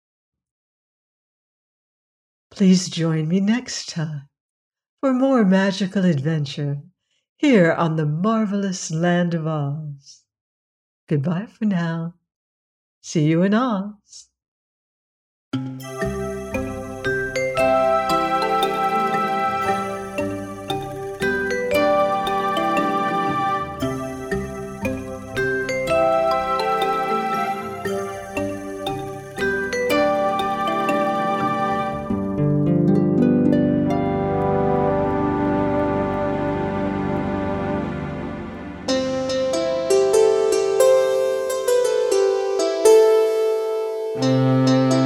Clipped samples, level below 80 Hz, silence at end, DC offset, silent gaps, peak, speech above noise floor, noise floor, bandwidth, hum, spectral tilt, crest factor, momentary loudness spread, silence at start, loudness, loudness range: under 0.1%; -46 dBFS; 0 s; under 0.1%; 4.40-4.71 s, 4.89-4.97 s, 7.29-7.36 s, 10.41-11.07 s, 12.36-13.02 s, 14.48-15.51 s; -4 dBFS; over 70 dB; under -90 dBFS; 16 kHz; none; -6 dB/octave; 18 dB; 11 LU; 2.55 s; -21 LUFS; 6 LU